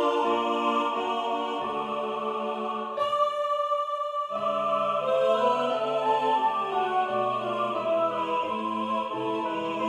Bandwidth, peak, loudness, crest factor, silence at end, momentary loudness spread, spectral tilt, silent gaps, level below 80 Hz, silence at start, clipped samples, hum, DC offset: 12.5 kHz; -12 dBFS; -27 LUFS; 16 dB; 0 s; 6 LU; -5 dB/octave; none; -80 dBFS; 0 s; under 0.1%; none; under 0.1%